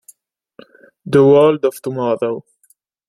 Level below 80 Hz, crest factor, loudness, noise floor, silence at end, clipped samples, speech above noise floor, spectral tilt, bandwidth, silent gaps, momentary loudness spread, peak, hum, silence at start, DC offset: -58 dBFS; 16 dB; -14 LUFS; -58 dBFS; 0.7 s; under 0.1%; 45 dB; -7.5 dB/octave; 13 kHz; none; 12 LU; -2 dBFS; none; 1.05 s; under 0.1%